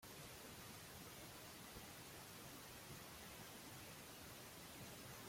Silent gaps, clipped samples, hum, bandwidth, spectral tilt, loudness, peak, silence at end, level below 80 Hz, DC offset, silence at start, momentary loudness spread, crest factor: none; under 0.1%; none; 16.5 kHz; -3 dB/octave; -56 LUFS; -42 dBFS; 0 s; -74 dBFS; under 0.1%; 0 s; 1 LU; 16 dB